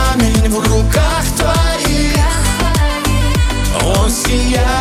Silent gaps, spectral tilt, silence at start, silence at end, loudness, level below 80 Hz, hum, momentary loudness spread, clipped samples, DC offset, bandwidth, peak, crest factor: none; -4.5 dB/octave; 0 s; 0 s; -14 LUFS; -16 dBFS; none; 2 LU; under 0.1%; under 0.1%; 16 kHz; 0 dBFS; 12 dB